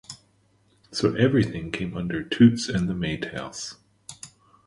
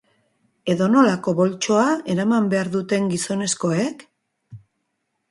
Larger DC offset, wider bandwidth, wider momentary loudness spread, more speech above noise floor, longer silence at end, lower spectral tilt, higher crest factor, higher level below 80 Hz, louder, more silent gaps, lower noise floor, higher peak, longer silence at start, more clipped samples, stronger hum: neither; about the same, 11.5 kHz vs 11.5 kHz; first, 25 LU vs 7 LU; second, 40 dB vs 55 dB; second, 0.4 s vs 0.7 s; about the same, -6 dB/octave vs -5 dB/octave; about the same, 20 dB vs 20 dB; first, -50 dBFS vs -64 dBFS; second, -24 LUFS vs -20 LUFS; neither; second, -63 dBFS vs -75 dBFS; about the same, -4 dBFS vs -2 dBFS; second, 0.1 s vs 0.65 s; neither; neither